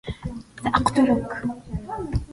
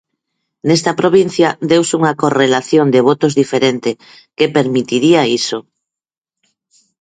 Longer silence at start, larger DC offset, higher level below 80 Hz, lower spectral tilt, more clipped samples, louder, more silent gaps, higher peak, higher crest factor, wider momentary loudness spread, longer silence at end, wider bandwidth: second, 0.05 s vs 0.65 s; neither; first, -38 dBFS vs -58 dBFS; first, -6.5 dB/octave vs -5 dB/octave; neither; second, -24 LUFS vs -13 LUFS; neither; second, -4 dBFS vs 0 dBFS; first, 20 dB vs 14 dB; first, 15 LU vs 9 LU; second, 0 s vs 1.4 s; first, 11.5 kHz vs 9.4 kHz